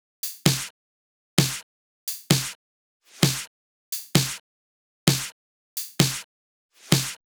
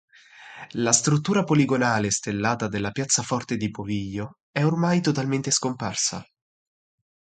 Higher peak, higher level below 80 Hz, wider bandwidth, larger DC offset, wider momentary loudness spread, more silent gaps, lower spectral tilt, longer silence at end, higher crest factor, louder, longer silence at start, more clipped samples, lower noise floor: first, 0 dBFS vs -4 dBFS; about the same, -58 dBFS vs -56 dBFS; first, over 20 kHz vs 9.6 kHz; neither; about the same, 12 LU vs 11 LU; first, 0.70-1.37 s, 1.63-2.07 s, 2.55-3.00 s, 3.47-3.92 s, 4.40-5.07 s, 5.32-5.77 s, 6.24-6.69 s vs 4.41-4.54 s; about the same, -3.5 dB/octave vs -4 dB/octave; second, 0.2 s vs 1 s; first, 28 dB vs 22 dB; about the same, -25 LUFS vs -23 LUFS; about the same, 0.25 s vs 0.35 s; neither; first, under -90 dBFS vs -47 dBFS